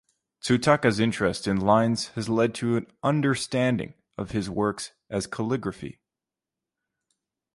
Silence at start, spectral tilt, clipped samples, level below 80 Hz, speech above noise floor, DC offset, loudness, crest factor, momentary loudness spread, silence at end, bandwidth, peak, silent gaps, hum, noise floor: 0.45 s; -5.5 dB/octave; under 0.1%; -54 dBFS; 65 dB; under 0.1%; -25 LUFS; 22 dB; 14 LU; 1.65 s; 11.5 kHz; -4 dBFS; none; none; -89 dBFS